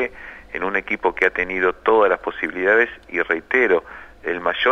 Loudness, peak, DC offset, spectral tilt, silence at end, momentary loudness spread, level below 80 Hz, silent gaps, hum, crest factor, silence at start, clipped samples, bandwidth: -20 LUFS; -4 dBFS; under 0.1%; -5 dB/octave; 0 s; 11 LU; -50 dBFS; none; none; 16 dB; 0 s; under 0.1%; 6.8 kHz